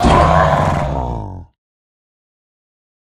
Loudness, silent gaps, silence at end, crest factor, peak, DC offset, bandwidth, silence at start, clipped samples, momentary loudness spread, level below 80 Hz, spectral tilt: -14 LUFS; none; 1.6 s; 16 dB; 0 dBFS; under 0.1%; 12 kHz; 0 s; under 0.1%; 16 LU; -26 dBFS; -6.5 dB/octave